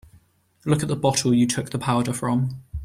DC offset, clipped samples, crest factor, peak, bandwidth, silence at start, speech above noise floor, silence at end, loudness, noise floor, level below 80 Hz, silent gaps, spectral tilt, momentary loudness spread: under 0.1%; under 0.1%; 16 dB; -6 dBFS; 16 kHz; 0.65 s; 35 dB; 0 s; -22 LUFS; -57 dBFS; -46 dBFS; none; -5.5 dB/octave; 6 LU